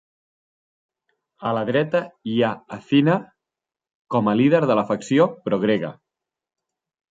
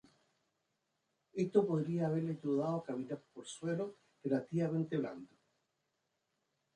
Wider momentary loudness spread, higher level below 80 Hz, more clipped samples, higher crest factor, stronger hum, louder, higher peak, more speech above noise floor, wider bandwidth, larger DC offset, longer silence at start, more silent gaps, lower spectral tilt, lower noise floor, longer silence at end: second, 9 LU vs 13 LU; first, -66 dBFS vs -82 dBFS; neither; about the same, 18 dB vs 22 dB; neither; first, -21 LUFS vs -37 LUFS; first, -4 dBFS vs -16 dBFS; first, 68 dB vs 48 dB; second, 7.8 kHz vs 10 kHz; neither; about the same, 1.4 s vs 1.35 s; first, 3.94-4.05 s vs none; about the same, -7 dB/octave vs -7.5 dB/octave; first, -88 dBFS vs -84 dBFS; second, 1.2 s vs 1.5 s